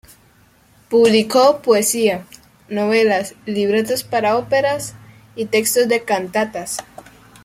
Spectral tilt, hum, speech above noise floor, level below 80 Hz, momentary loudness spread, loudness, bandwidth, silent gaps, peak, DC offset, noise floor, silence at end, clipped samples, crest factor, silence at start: -3.5 dB/octave; none; 36 dB; -58 dBFS; 13 LU; -17 LUFS; 16 kHz; none; -2 dBFS; under 0.1%; -52 dBFS; 0.6 s; under 0.1%; 16 dB; 0.9 s